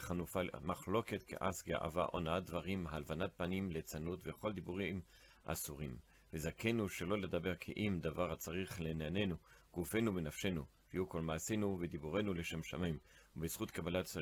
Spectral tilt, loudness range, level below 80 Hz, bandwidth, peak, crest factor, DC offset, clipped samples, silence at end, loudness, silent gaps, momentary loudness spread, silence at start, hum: -5.5 dB/octave; 3 LU; -62 dBFS; 19 kHz; -24 dBFS; 18 dB; under 0.1%; under 0.1%; 0 s; -42 LUFS; none; 7 LU; 0 s; none